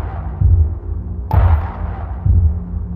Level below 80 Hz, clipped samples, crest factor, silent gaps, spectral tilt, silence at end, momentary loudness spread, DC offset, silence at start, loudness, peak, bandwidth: -18 dBFS; under 0.1%; 14 dB; none; -11 dB/octave; 0 s; 11 LU; under 0.1%; 0 s; -18 LUFS; -2 dBFS; 3.3 kHz